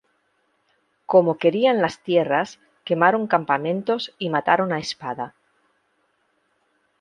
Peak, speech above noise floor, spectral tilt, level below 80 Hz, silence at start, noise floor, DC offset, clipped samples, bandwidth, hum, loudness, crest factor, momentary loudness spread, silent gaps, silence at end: -2 dBFS; 48 dB; -5.5 dB/octave; -68 dBFS; 1.1 s; -68 dBFS; under 0.1%; under 0.1%; 9.8 kHz; none; -21 LUFS; 22 dB; 12 LU; none; 1.7 s